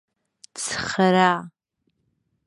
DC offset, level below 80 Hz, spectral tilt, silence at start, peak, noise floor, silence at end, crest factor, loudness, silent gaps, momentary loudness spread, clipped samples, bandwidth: under 0.1%; -60 dBFS; -4.5 dB/octave; 0.55 s; -2 dBFS; -73 dBFS; 0.95 s; 22 dB; -21 LUFS; none; 13 LU; under 0.1%; 11.5 kHz